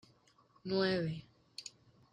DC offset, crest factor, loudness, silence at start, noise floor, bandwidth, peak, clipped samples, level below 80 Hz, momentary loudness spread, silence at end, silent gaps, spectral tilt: under 0.1%; 18 dB; -37 LUFS; 0.65 s; -69 dBFS; 10 kHz; -22 dBFS; under 0.1%; -72 dBFS; 18 LU; 0.45 s; none; -5.5 dB/octave